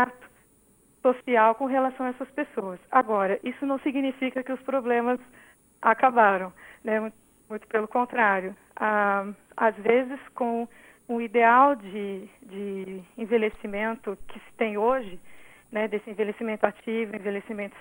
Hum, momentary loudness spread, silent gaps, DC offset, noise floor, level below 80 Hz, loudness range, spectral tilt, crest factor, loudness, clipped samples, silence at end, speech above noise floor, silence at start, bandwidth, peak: none; 15 LU; none; under 0.1%; -61 dBFS; -62 dBFS; 5 LU; -6.5 dB/octave; 22 dB; -26 LUFS; under 0.1%; 0 s; 35 dB; 0 s; 16.5 kHz; -4 dBFS